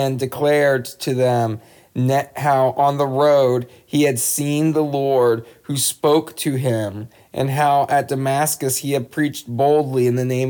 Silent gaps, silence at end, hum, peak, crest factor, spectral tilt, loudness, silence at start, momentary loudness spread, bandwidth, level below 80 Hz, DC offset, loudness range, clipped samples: none; 0 s; none; -4 dBFS; 14 dB; -5 dB/octave; -19 LUFS; 0 s; 8 LU; over 20 kHz; -64 dBFS; under 0.1%; 2 LU; under 0.1%